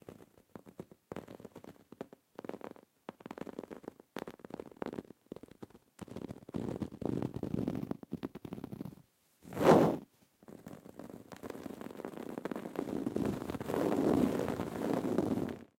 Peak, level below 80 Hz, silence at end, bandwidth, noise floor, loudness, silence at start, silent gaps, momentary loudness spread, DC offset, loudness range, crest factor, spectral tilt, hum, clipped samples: -10 dBFS; -64 dBFS; 0.15 s; 16.5 kHz; -65 dBFS; -36 LUFS; 0.1 s; none; 22 LU; under 0.1%; 15 LU; 26 dB; -7 dB/octave; none; under 0.1%